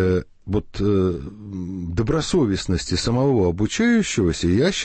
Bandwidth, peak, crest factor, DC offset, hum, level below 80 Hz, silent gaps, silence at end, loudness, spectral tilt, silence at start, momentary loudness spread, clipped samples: 8.8 kHz; -8 dBFS; 12 dB; under 0.1%; none; -38 dBFS; none; 0 s; -21 LUFS; -5.5 dB/octave; 0 s; 10 LU; under 0.1%